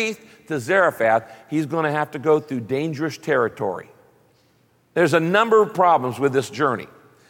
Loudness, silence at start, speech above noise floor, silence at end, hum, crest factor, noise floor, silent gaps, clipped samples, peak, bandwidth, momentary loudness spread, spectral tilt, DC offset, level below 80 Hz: -21 LUFS; 0 s; 40 dB; 0.45 s; none; 16 dB; -60 dBFS; none; under 0.1%; -4 dBFS; 17 kHz; 11 LU; -5.5 dB/octave; under 0.1%; -70 dBFS